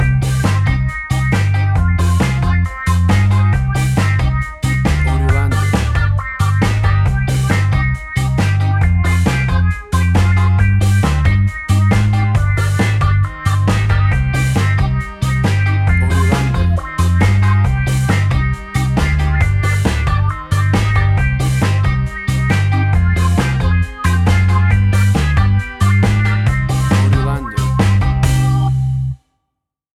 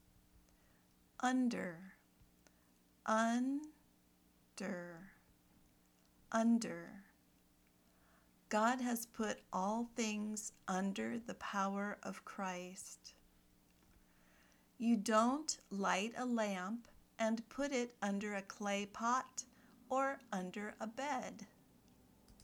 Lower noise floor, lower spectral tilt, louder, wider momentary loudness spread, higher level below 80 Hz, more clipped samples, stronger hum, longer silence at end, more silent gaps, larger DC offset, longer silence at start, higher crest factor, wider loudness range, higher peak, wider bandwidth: first, -76 dBFS vs -72 dBFS; first, -6.5 dB/octave vs -4 dB/octave; first, -15 LUFS vs -40 LUFS; second, 4 LU vs 16 LU; first, -22 dBFS vs -76 dBFS; neither; neither; first, 0.85 s vs 0 s; neither; neither; second, 0 s vs 1.2 s; second, 12 dB vs 22 dB; second, 1 LU vs 6 LU; first, -2 dBFS vs -20 dBFS; second, 13 kHz vs over 20 kHz